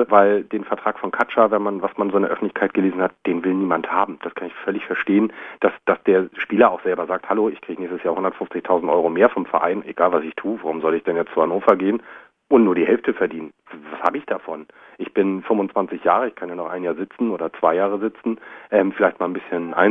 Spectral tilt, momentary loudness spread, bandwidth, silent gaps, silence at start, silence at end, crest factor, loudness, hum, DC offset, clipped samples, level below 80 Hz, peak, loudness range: -8.5 dB/octave; 11 LU; 3.9 kHz; none; 0 s; 0 s; 20 dB; -20 LUFS; none; under 0.1%; under 0.1%; -64 dBFS; 0 dBFS; 3 LU